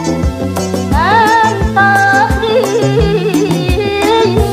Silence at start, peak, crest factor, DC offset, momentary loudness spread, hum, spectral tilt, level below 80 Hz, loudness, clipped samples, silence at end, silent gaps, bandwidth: 0 s; 0 dBFS; 10 dB; under 0.1%; 7 LU; none; -5.5 dB/octave; -22 dBFS; -11 LUFS; under 0.1%; 0 s; none; 16 kHz